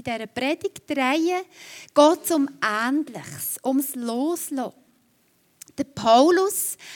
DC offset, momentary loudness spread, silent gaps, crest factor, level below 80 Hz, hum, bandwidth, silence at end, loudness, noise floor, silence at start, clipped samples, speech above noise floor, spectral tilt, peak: under 0.1%; 15 LU; none; 20 dB; -68 dBFS; none; 18 kHz; 0 s; -22 LUFS; -64 dBFS; 0.05 s; under 0.1%; 41 dB; -3 dB/octave; -4 dBFS